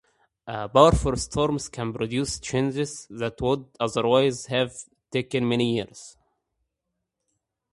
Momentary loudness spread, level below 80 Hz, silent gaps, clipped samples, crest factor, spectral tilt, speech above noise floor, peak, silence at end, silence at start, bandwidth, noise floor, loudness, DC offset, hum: 14 LU; -42 dBFS; none; under 0.1%; 26 dB; -5 dB/octave; 57 dB; 0 dBFS; 1.65 s; 0.45 s; 11.5 kHz; -82 dBFS; -24 LUFS; under 0.1%; none